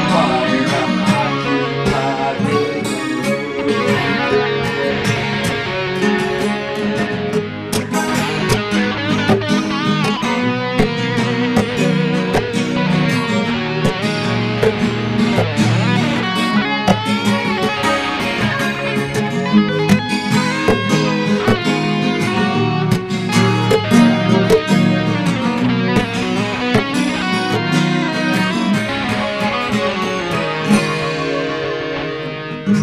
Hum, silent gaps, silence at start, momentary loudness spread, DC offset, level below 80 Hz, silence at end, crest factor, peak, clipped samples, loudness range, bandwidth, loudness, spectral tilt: none; none; 0 s; 4 LU; 0.1%; -44 dBFS; 0 s; 16 dB; 0 dBFS; under 0.1%; 3 LU; 15 kHz; -16 LUFS; -5.5 dB/octave